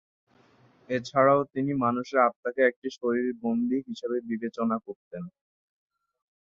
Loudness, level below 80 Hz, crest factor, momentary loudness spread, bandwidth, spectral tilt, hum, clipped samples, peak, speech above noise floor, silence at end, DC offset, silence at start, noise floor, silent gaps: -27 LUFS; -70 dBFS; 22 dB; 13 LU; 7.4 kHz; -7 dB/octave; none; under 0.1%; -8 dBFS; 34 dB; 1.2 s; under 0.1%; 0.9 s; -61 dBFS; 2.36-2.43 s, 2.76-2.82 s, 4.96-5.11 s